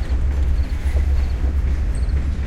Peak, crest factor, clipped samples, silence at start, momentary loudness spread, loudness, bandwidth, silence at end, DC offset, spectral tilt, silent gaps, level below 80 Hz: -8 dBFS; 10 dB; under 0.1%; 0 s; 2 LU; -22 LUFS; 9 kHz; 0 s; under 0.1%; -7.5 dB/octave; none; -18 dBFS